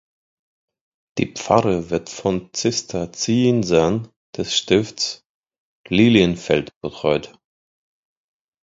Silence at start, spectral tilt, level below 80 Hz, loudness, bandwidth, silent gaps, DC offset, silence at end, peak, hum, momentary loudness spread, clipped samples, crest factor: 1.15 s; -5 dB/octave; -48 dBFS; -20 LUFS; 7.8 kHz; 4.16-4.33 s, 5.26-5.43 s, 5.58-5.84 s, 6.76-6.81 s; under 0.1%; 1.35 s; 0 dBFS; none; 11 LU; under 0.1%; 22 dB